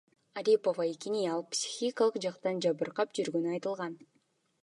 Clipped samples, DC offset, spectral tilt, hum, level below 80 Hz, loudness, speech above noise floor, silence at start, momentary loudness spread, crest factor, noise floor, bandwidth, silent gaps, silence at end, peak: under 0.1%; under 0.1%; -4 dB/octave; none; -86 dBFS; -32 LUFS; 42 dB; 0.35 s; 9 LU; 18 dB; -74 dBFS; 11.5 kHz; none; 0.6 s; -14 dBFS